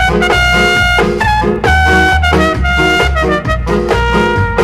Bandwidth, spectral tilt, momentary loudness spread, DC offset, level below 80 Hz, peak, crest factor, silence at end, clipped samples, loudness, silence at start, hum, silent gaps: 15 kHz; -5 dB/octave; 4 LU; under 0.1%; -18 dBFS; 0 dBFS; 10 dB; 0 s; under 0.1%; -10 LUFS; 0 s; none; none